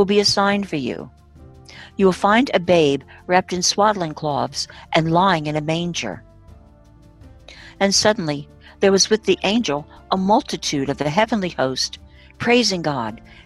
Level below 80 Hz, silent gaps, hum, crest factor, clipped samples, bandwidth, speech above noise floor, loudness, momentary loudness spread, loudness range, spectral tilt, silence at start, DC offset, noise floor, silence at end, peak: -48 dBFS; none; none; 18 dB; under 0.1%; 12.5 kHz; 29 dB; -19 LUFS; 11 LU; 4 LU; -4 dB/octave; 0 s; under 0.1%; -48 dBFS; 0.1 s; -2 dBFS